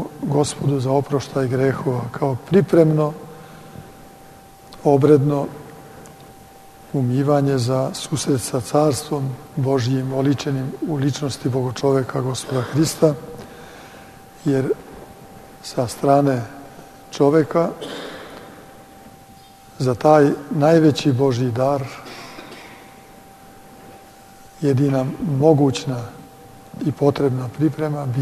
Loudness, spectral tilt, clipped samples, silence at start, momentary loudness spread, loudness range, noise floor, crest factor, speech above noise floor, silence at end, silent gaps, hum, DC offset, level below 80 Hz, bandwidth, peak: -19 LUFS; -6.5 dB/octave; under 0.1%; 0 s; 24 LU; 5 LU; -45 dBFS; 20 dB; 26 dB; 0 s; none; none; under 0.1%; -54 dBFS; 13.5 kHz; -2 dBFS